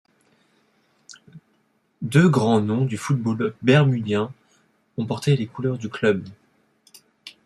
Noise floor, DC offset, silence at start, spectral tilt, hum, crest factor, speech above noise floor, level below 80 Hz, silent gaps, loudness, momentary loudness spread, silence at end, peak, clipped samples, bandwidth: -66 dBFS; under 0.1%; 1.35 s; -7 dB/octave; none; 20 dB; 45 dB; -62 dBFS; none; -21 LUFS; 16 LU; 0.15 s; -4 dBFS; under 0.1%; 12.5 kHz